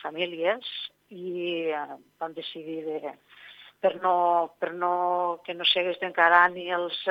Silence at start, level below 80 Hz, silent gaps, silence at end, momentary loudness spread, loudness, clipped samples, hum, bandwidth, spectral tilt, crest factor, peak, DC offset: 0 s; -82 dBFS; none; 0 s; 16 LU; -26 LUFS; under 0.1%; 50 Hz at -75 dBFS; over 20 kHz; -5 dB/octave; 22 dB; -4 dBFS; under 0.1%